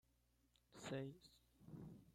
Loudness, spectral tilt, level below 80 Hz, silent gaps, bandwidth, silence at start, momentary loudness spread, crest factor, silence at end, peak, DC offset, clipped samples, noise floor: -54 LUFS; -5.5 dB/octave; -78 dBFS; none; 16 kHz; 0.45 s; 18 LU; 20 dB; 0 s; -36 dBFS; under 0.1%; under 0.1%; -80 dBFS